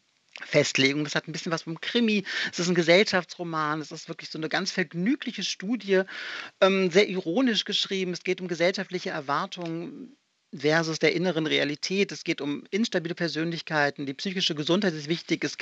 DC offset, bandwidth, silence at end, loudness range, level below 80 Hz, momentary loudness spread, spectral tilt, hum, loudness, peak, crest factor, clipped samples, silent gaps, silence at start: under 0.1%; 8.2 kHz; 0 s; 3 LU; -82 dBFS; 10 LU; -4.5 dB/octave; none; -26 LUFS; -6 dBFS; 20 dB; under 0.1%; none; 0.35 s